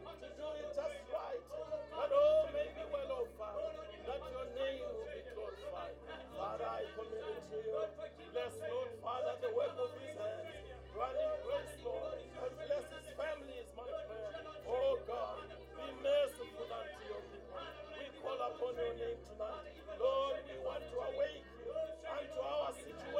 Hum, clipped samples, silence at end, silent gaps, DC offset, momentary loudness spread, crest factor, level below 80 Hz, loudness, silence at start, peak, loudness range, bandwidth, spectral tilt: none; under 0.1%; 0 s; none; under 0.1%; 12 LU; 20 dB; -62 dBFS; -42 LUFS; 0 s; -22 dBFS; 6 LU; 14.5 kHz; -4.5 dB/octave